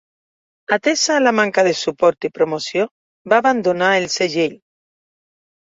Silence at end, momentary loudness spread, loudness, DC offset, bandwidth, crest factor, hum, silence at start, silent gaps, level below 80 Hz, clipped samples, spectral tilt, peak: 1.2 s; 7 LU; -17 LUFS; under 0.1%; 8 kHz; 16 dB; none; 0.7 s; 2.91-3.25 s; -64 dBFS; under 0.1%; -3 dB/octave; -2 dBFS